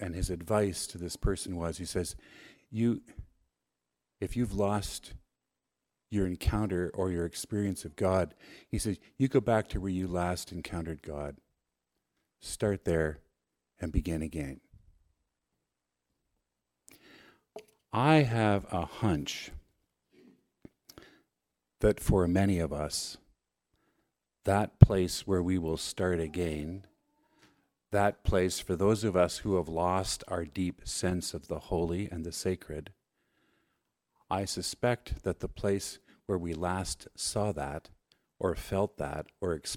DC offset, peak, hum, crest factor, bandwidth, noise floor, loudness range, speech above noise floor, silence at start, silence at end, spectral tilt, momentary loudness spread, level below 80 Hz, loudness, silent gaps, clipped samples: under 0.1%; -2 dBFS; none; 32 dB; 16.5 kHz; -87 dBFS; 8 LU; 56 dB; 0 s; 0 s; -5.5 dB/octave; 13 LU; -46 dBFS; -32 LUFS; none; under 0.1%